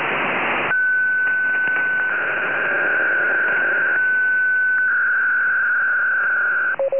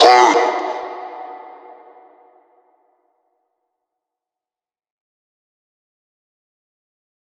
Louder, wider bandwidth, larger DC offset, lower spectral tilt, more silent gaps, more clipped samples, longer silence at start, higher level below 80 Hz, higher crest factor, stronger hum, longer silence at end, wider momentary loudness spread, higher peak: about the same, -17 LUFS vs -15 LUFS; second, 3.5 kHz vs 9.6 kHz; first, 0.6% vs under 0.1%; first, -7 dB/octave vs -1 dB/octave; neither; neither; about the same, 0 s vs 0 s; first, -64 dBFS vs -80 dBFS; second, 8 dB vs 22 dB; neither; second, 0 s vs 6 s; second, 3 LU vs 26 LU; second, -10 dBFS vs 0 dBFS